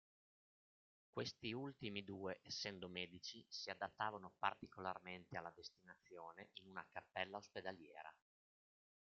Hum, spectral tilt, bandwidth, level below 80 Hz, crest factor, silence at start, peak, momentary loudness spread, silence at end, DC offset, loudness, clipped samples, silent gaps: none; -2 dB/octave; 7.4 kHz; -86 dBFS; 26 dB; 1.15 s; -24 dBFS; 13 LU; 0.9 s; under 0.1%; -50 LUFS; under 0.1%; none